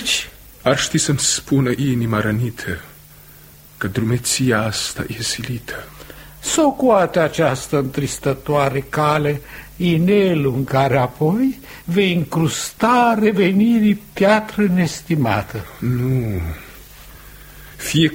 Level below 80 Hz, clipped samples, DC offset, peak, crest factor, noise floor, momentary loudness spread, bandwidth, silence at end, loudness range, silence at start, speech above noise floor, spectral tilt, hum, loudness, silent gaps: -42 dBFS; under 0.1%; under 0.1%; -2 dBFS; 16 dB; -43 dBFS; 13 LU; 16.5 kHz; 0 s; 5 LU; 0 s; 26 dB; -5 dB/octave; none; -18 LUFS; none